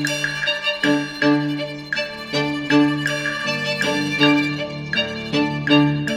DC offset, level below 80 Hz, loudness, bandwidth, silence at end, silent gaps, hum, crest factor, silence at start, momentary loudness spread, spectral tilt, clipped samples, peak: under 0.1%; -52 dBFS; -20 LUFS; 14.5 kHz; 0 s; none; none; 18 dB; 0 s; 8 LU; -4.5 dB/octave; under 0.1%; -2 dBFS